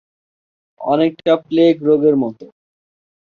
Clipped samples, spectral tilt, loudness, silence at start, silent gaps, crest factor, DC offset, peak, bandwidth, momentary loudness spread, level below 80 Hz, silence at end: under 0.1%; -8.5 dB/octave; -15 LUFS; 0.8 s; none; 16 dB; under 0.1%; -2 dBFS; 6.6 kHz; 8 LU; -62 dBFS; 0.8 s